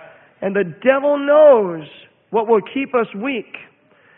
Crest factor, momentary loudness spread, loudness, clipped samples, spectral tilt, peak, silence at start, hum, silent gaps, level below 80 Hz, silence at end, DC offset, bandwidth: 16 dB; 16 LU; -16 LUFS; under 0.1%; -11 dB/octave; 0 dBFS; 0.4 s; none; none; -68 dBFS; 0.6 s; under 0.1%; 3.8 kHz